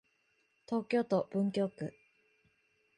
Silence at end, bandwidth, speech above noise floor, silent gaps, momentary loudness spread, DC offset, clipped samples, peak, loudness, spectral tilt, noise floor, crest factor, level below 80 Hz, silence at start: 1.1 s; 11 kHz; 42 dB; none; 10 LU; under 0.1%; under 0.1%; -20 dBFS; -35 LUFS; -7.5 dB/octave; -75 dBFS; 18 dB; -78 dBFS; 0.7 s